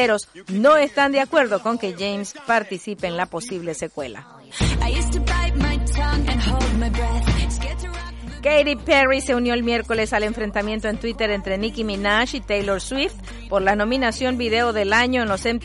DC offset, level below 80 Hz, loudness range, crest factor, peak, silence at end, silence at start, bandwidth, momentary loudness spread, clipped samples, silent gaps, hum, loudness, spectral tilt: under 0.1%; -28 dBFS; 4 LU; 16 dB; -4 dBFS; 0 s; 0 s; 11.5 kHz; 11 LU; under 0.1%; none; none; -21 LUFS; -5 dB/octave